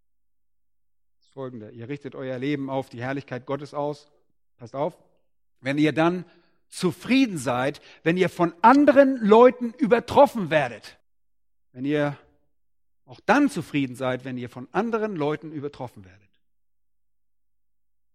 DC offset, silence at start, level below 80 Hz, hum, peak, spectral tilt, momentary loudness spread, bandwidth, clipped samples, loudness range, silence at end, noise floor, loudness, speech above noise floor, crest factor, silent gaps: under 0.1%; 1.35 s; -64 dBFS; none; -2 dBFS; -6.5 dB/octave; 19 LU; 14.5 kHz; under 0.1%; 13 LU; 2.1 s; -86 dBFS; -23 LUFS; 63 dB; 22 dB; none